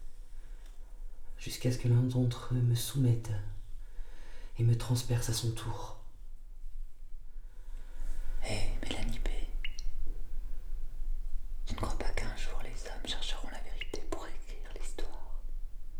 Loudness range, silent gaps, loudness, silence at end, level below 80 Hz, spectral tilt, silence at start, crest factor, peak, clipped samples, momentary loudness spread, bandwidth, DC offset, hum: 10 LU; none; -36 LUFS; 0 s; -36 dBFS; -5.5 dB/octave; 0 s; 14 dB; -18 dBFS; under 0.1%; 23 LU; 15 kHz; under 0.1%; none